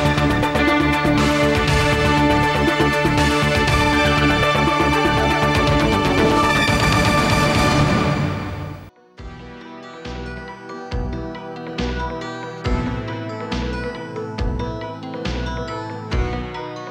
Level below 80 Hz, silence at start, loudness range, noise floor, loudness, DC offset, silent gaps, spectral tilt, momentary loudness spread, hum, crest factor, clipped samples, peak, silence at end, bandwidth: -30 dBFS; 0 s; 13 LU; -39 dBFS; -18 LUFS; under 0.1%; none; -5.5 dB/octave; 15 LU; none; 12 dB; under 0.1%; -6 dBFS; 0 s; 16.5 kHz